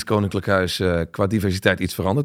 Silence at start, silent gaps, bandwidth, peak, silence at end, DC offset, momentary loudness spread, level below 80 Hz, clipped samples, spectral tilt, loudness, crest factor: 0 s; none; 16.5 kHz; -2 dBFS; 0 s; under 0.1%; 3 LU; -48 dBFS; under 0.1%; -6 dB/octave; -21 LUFS; 18 dB